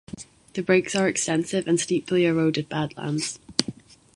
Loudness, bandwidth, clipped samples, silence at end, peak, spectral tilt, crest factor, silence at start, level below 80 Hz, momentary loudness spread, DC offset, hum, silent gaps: -24 LUFS; 11.5 kHz; under 0.1%; 0.45 s; -2 dBFS; -4.5 dB/octave; 24 dB; 0.1 s; -60 dBFS; 11 LU; under 0.1%; none; none